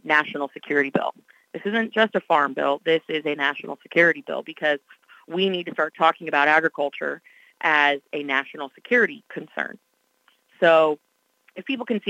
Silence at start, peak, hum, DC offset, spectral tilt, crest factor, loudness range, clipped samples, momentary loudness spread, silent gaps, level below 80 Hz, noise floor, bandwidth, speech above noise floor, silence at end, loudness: 0.05 s; -4 dBFS; none; under 0.1%; -5.5 dB/octave; 20 dB; 2 LU; under 0.1%; 14 LU; none; -82 dBFS; -64 dBFS; 9.8 kHz; 42 dB; 0 s; -22 LUFS